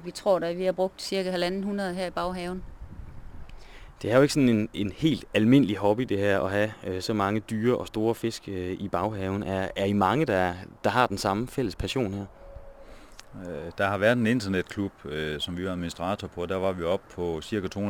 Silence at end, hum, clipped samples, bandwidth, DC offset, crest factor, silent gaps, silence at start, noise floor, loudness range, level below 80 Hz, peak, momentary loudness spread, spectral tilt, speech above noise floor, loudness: 0 s; none; under 0.1%; 19 kHz; under 0.1%; 20 dB; none; 0 s; -47 dBFS; 6 LU; -50 dBFS; -6 dBFS; 12 LU; -6 dB/octave; 20 dB; -27 LUFS